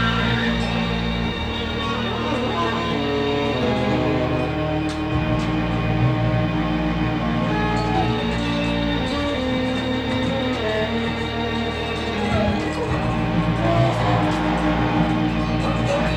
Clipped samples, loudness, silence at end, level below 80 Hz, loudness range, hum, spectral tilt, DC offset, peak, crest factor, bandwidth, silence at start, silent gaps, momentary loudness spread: under 0.1%; -21 LUFS; 0 s; -32 dBFS; 2 LU; none; -6.5 dB/octave; under 0.1%; -6 dBFS; 14 dB; 10 kHz; 0 s; none; 4 LU